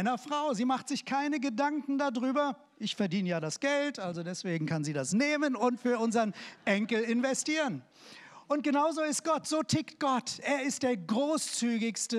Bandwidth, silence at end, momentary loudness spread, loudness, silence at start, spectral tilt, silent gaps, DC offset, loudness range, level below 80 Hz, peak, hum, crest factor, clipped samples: 13.5 kHz; 0 s; 6 LU; -31 LUFS; 0 s; -4 dB/octave; none; under 0.1%; 2 LU; -80 dBFS; -14 dBFS; none; 18 dB; under 0.1%